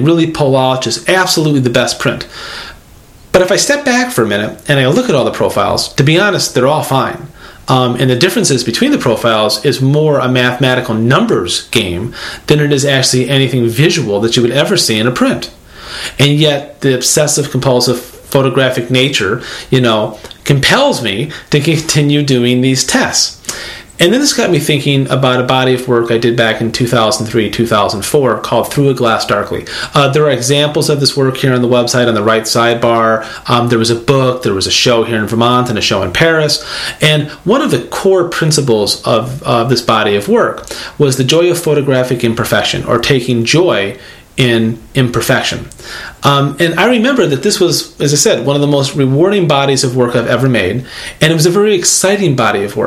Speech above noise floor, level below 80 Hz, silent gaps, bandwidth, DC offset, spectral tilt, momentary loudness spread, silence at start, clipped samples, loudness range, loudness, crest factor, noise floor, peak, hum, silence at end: 27 dB; -42 dBFS; none; 16 kHz; under 0.1%; -4.5 dB/octave; 6 LU; 0 s; 0.2%; 2 LU; -11 LUFS; 12 dB; -38 dBFS; 0 dBFS; none; 0 s